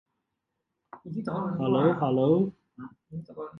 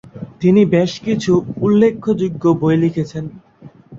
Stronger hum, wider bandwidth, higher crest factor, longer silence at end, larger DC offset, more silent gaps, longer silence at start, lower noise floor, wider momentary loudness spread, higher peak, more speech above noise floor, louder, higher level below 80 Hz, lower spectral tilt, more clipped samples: neither; second, 5.6 kHz vs 7.8 kHz; about the same, 18 dB vs 14 dB; about the same, 0 s vs 0 s; neither; neither; first, 0.95 s vs 0.15 s; first, -83 dBFS vs -40 dBFS; first, 23 LU vs 12 LU; second, -10 dBFS vs -2 dBFS; first, 56 dB vs 25 dB; second, -26 LUFS vs -16 LUFS; second, -68 dBFS vs -50 dBFS; first, -10.5 dB/octave vs -7.5 dB/octave; neither